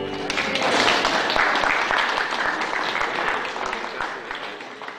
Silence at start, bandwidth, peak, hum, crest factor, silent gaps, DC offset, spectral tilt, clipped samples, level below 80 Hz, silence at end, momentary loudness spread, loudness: 0 s; 15.5 kHz; -4 dBFS; none; 18 dB; none; under 0.1%; -2 dB/octave; under 0.1%; -52 dBFS; 0 s; 12 LU; -22 LUFS